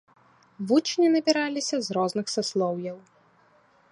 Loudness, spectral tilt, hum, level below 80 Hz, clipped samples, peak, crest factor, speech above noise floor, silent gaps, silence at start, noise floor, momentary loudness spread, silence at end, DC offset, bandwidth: -25 LUFS; -4 dB/octave; none; -76 dBFS; under 0.1%; -8 dBFS; 18 dB; 36 dB; none; 0.6 s; -61 dBFS; 14 LU; 0.9 s; under 0.1%; 11.5 kHz